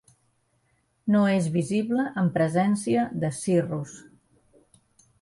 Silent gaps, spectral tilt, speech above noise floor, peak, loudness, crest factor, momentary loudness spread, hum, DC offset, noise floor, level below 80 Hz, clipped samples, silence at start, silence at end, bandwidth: none; -6.5 dB/octave; 45 dB; -10 dBFS; -25 LUFS; 16 dB; 9 LU; none; under 0.1%; -69 dBFS; -64 dBFS; under 0.1%; 1.05 s; 1.2 s; 11.5 kHz